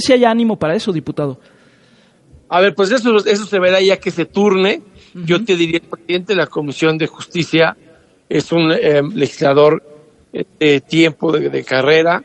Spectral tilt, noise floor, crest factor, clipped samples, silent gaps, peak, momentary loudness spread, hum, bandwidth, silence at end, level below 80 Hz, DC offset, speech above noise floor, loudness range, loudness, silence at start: -5.5 dB/octave; -50 dBFS; 14 dB; under 0.1%; none; 0 dBFS; 10 LU; none; 11 kHz; 0 s; -56 dBFS; under 0.1%; 36 dB; 3 LU; -15 LUFS; 0 s